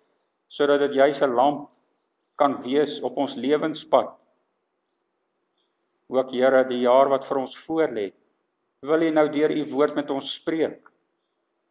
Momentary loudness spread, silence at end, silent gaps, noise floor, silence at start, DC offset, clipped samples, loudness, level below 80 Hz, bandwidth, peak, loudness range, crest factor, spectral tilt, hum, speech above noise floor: 9 LU; 0.95 s; none; -75 dBFS; 0.5 s; under 0.1%; under 0.1%; -23 LUFS; -80 dBFS; 4 kHz; -4 dBFS; 4 LU; 20 dB; -9 dB/octave; none; 53 dB